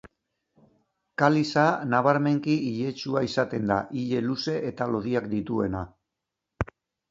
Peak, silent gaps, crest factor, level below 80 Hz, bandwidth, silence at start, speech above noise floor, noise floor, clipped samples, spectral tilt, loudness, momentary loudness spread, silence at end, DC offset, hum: -6 dBFS; none; 22 dB; -52 dBFS; 7.8 kHz; 1.2 s; 60 dB; -85 dBFS; under 0.1%; -6.5 dB/octave; -26 LUFS; 13 LU; 0.5 s; under 0.1%; none